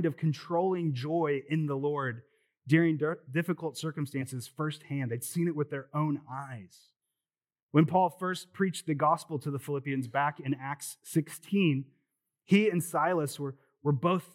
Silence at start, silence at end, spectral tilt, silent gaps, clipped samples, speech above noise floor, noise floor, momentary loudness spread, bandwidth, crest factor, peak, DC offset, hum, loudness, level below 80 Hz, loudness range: 0 s; 0.1 s; -6.5 dB/octave; 7.62-7.69 s; under 0.1%; over 60 dB; under -90 dBFS; 11 LU; 16 kHz; 20 dB; -10 dBFS; under 0.1%; none; -31 LUFS; under -90 dBFS; 4 LU